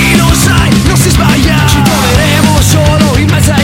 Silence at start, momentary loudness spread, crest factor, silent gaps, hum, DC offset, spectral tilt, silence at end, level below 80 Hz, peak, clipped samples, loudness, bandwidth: 0 s; 1 LU; 6 dB; none; none; under 0.1%; -4.5 dB/octave; 0 s; -16 dBFS; 0 dBFS; 0.9%; -7 LUFS; 17 kHz